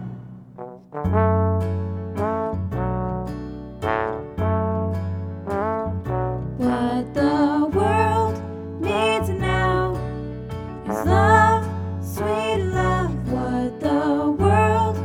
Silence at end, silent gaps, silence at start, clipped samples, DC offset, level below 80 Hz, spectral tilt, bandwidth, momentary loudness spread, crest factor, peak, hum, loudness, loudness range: 0 s; none; 0 s; under 0.1%; under 0.1%; -38 dBFS; -7 dB/octave; 15 kHz; 13 LU; 18 dB; -4 dBFS; none; -22 LUFS; 5 LU